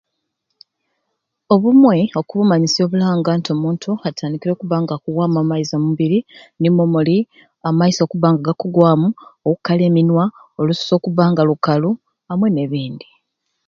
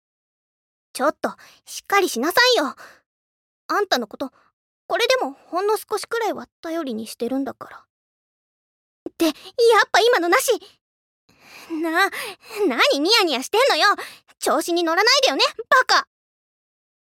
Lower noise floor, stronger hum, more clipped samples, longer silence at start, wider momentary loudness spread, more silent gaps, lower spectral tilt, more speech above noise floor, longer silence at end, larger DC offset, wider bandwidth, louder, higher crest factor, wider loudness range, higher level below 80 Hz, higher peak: second, -74 dBFS vs under -90 dBFS; neither; neither; first, 1.5 s vs 0.95 s; second, 9 LU vs 16 LU; second, none vs 3.06-3.69 s, 4.53-4.89 s, 6.52-6.63 s, 7.90-9.06 s, 10.81-11.28 s; first, -7 dB/octave vs -1 dB/octave; second, 59 dB vs over 70 dB; second, 0.7 s vs 1 s; neither; second, 7.4 kHz vs 17 kHz; first, -16 LUFS vs -19 LUFS; about the same, 16 dB vs 18 dB; second, 3 LU vs 9 LU; first, -60 dBFS vs -70 dBFS; first, 0 dBFS vs -4 dBFS